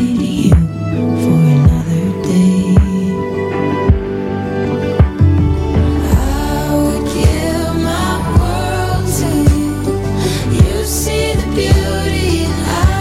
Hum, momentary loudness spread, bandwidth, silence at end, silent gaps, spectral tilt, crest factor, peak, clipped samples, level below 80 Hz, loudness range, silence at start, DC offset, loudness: none; 5 LU; 16 kHz; 0 s; none; -6.5 dB/octave; 12 dB; 0 dBFS; 0.4%; -20 dBFS; 2 LU; 0 s; under 0.1%; -14 LUFS